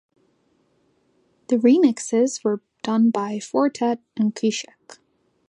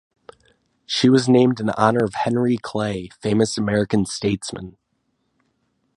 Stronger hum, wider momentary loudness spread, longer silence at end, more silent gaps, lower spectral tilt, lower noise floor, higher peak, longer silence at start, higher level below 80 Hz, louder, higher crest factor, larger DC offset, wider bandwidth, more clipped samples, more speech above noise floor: neither; about the same, 9 LU vs 11 LU; second, 0.85 s vs 1.25 s; neither; about the same, -5 dB/octave vs -5.5 dB/octave; second, -65 dBFS vs -70 dBFS; second, -4 dBFS vs 0 dBFS; first, 1.5 s vs 0.9 s; second, -76 dBFS vs -52 dBFS; about the same, -21 LUFS vs -20 LUFS; about the same, 18 dB vs 20 dB; neither; about the same, 10.5 kHz vs 11.5 kHz; neither; second, 44 dB vs 51 dB